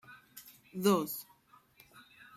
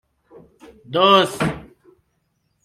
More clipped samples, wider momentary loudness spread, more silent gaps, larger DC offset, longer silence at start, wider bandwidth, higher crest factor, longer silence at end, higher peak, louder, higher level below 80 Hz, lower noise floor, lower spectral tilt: neither; first, 26 LU vs 13 LU; neither; neither; second, 0.1 s vs 0.9 s; first, 16 kHz vs 14.5 kHz; about the same, 24 dB vs 20 dB; second, 0.35 s vs 1.05 s; second, -14 dBFS vs -2 dBFS; second, -32 LUFS vs -17 LUFS; second, -78 dBFS vs -52 dBFS; second, -64 dBFS vs -69 dBFS; about the same, -5 dB/octave vs -4.5 dB/octave